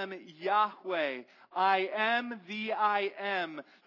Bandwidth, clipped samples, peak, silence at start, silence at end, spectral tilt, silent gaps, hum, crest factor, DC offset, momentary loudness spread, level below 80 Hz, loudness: 6 kHz; under 0.1%; -14 dBFS; 0 s; 0.25 s; -5 dB/octave; none; none; 18 dB; under 0.1%; 11 LU; under -90 dBFS; -31 LUFS